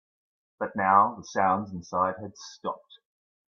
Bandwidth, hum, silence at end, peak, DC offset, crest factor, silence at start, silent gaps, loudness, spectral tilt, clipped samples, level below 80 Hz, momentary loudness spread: 7.4 kHz; none; 0.7 s; -6 dBFS; under 0.1%; 24 dB; 0.6 s; none; -27 LUFS; -5.5 dB/octave; under 0.1%; -72 dBFS; 17 LU